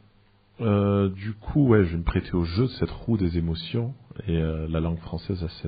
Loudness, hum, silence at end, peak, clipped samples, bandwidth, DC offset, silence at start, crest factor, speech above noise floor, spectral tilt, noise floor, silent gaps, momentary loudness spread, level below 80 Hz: -26 LUFS; none; 0 s; -8 dBFS; under 0.1%; 5 kHz; under 0.1%; 0.6 s; 18 dB; 35 dB; -7.5 dB/octave; -59 dBFS; none; 11 LU; -38 dBFS